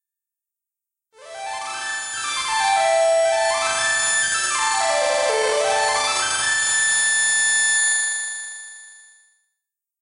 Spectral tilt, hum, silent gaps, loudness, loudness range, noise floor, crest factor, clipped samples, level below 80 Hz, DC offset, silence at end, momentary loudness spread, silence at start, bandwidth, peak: 2 dB/octave; none; none; -18 LUFS; 4 LU; -87 dBFS; 12 dB; under 0.1%; -62 dBFS; under 0.1%; 1.05 s; 13 LU; 1.2 s; 11 kHz; -8 dBFS